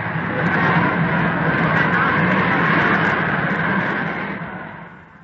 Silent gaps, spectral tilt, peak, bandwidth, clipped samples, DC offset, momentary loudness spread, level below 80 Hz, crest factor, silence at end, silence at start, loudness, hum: none; -8 dB/octave; -4 dBFS; 6.8 kHz; under 0.1%; under 0.1%; 12 LU; -46 dBFS; 14 dB; 0.2 s; 0 s; -18 LUFS; none